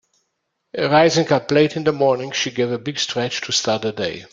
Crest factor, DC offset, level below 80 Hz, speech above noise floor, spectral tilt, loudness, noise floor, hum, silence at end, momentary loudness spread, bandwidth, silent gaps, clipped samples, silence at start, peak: 18 dB; under 0.1%; -60 dBFS; 55 dB; -4 dB/octave; -19 LUFS; -74 dBFS; none; 0.05 s; 9 LU; 9.4 kHz; none; under 0.1%; 0.75 s; -2 dBFS